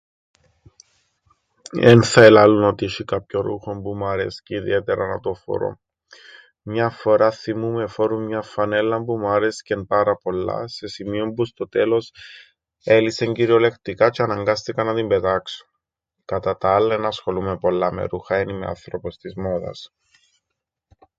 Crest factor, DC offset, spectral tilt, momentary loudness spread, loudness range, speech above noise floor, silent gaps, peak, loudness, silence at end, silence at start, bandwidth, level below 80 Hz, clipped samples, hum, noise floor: 20 dB; under 0.1%; -6 dB/octave; 14 LU; 9 LU; 61 dB; none; 0 dBFS; -20 LUFS; 1.35 s; 1.75 s; 9.4 kHz; -50 dBFS; under 0.1%; none; -81 dBFS